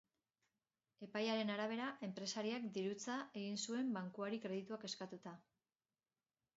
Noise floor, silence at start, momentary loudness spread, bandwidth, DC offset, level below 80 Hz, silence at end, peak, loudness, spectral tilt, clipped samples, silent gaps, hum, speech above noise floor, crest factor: under -90 dBFS; 1 s; 9 LU; 7.6 kHz; under 0.1%; under -90 dBFS; 1.15 s; -28 dBFS; -44 LUFS; -3.5 dB/octave; under 0.1%; none; none; over 46 dB; 18 dB